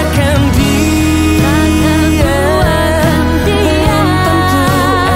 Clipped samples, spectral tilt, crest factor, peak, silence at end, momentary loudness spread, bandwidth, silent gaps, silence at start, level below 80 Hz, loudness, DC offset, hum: under 0.1%; -5.5 dB/octave; 10 dB; 0 dBFS; 0 s; 1 LU; 16.5 kHz; none; 0 s; -20 dBFS; -10 LUFS; under 0.1%; none